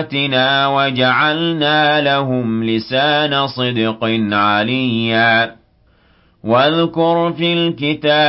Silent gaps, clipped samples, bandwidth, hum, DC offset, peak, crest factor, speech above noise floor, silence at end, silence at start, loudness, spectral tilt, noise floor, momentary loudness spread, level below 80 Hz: none; under 0.1%; 5.8 kHz; none; under 0.1%; -2 dBFS; 12 dB; 39 dB; 0 s; 0 s; -15 LUFS; -10 dB/octave; -53 dBFS; 5 LU; -54 dBFS